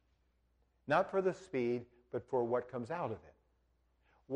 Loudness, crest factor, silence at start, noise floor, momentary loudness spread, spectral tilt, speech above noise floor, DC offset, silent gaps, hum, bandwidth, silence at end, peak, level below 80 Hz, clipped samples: -37 LUFS; 20 dB; 0.85 s; -76 dBFS; 12 LU; -7 dB/octave; 39 dB; under 0.1%; none; none; 9.6 kHz; 0 s; -20 dBFS; -74 dBFS; under 0.1%